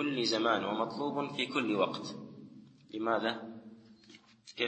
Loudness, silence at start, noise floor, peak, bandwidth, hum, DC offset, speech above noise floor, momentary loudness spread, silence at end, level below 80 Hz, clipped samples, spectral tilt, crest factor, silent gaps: -33 LUFS; 0 s; -59 dBFS; -14 dBFS; 8.4 kHz; none; under 0.1%; 26 dB; 21 LU; 0 s; -82 dBFS; under 0.1%; -4.5 dB/octave; 20 dB; none